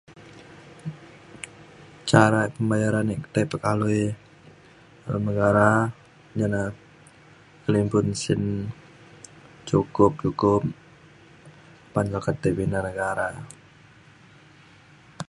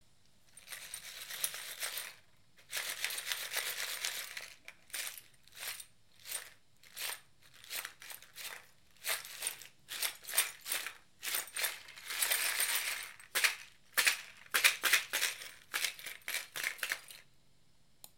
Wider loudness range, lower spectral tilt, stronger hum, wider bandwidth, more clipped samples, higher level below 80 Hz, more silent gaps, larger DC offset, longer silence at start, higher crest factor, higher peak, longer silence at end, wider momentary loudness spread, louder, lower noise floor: second, 5 LU vs 12 LU; first, -6.5 dB/octave vs 2.5 dB/octave; neither; second, 11.5 kHz vs 17 kHz; neither; first, -50 dBFS vs -78 dBFS; neither; neither; second, 0.1 s vs 0.55 s; about the same, 26 dB vs 30 dB; first, 0 dBFS vs -10 dBFS; about the same, 0.05 s vs 0.1 s; first, 22 LU vs 18 LU; first, -24 LUFS vs -36 LUFS; second, -52 dBFS vs -71 dBFS